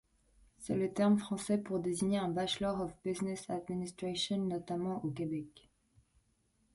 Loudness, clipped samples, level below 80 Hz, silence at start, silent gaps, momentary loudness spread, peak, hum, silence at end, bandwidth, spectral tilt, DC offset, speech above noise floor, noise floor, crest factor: -36 LUFS; under 0.1%; -66 dBFS; 0.6 s; none; 9 LU; -20 dBFS; none; 1.15 s; 11.5 kHz; -5.5 dB/octave; under 0.1%; 40 dB; -75 dBFS; 18 dB